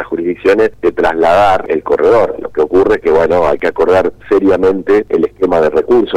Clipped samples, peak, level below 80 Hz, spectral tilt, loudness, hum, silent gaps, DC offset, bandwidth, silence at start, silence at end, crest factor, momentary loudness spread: under 0.1%; -2 dBFS; -38 dBFS; -6.5 dB/octave; -11 LUFS; none; none; under 0.1%; 10.5 kHz; 0 s; 0 s; 10 dB; 4 LU